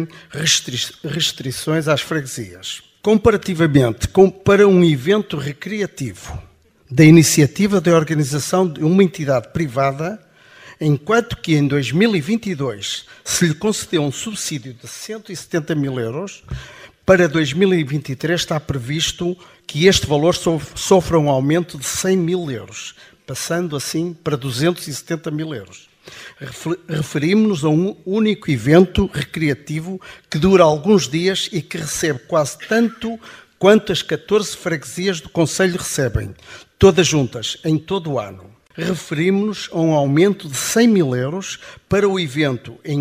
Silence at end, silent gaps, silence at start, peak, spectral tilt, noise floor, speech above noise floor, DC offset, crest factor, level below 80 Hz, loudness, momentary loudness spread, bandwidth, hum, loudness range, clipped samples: 0 s; none; 0 s; 0 dBFS; -5 dB/octave; -44 dBFS; 26 dB; under 0.1%; 18 dB; -42 dBFS; -17 LUFS; 15 LU; 15.5 kHz; none; 6 LU; under 0.1%